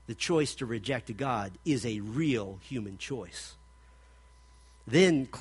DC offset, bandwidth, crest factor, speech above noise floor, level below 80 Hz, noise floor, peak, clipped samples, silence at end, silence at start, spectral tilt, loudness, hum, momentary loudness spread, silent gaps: under 0.1%; 11.5 kHz; 22 dB; 26 dB; -56 dBFS; -57 dBFS; -10 dBFS; under 0.1%; 0 s; 0.1 s; -5 dB/octave; -30 LUFS; none; 14 LU; none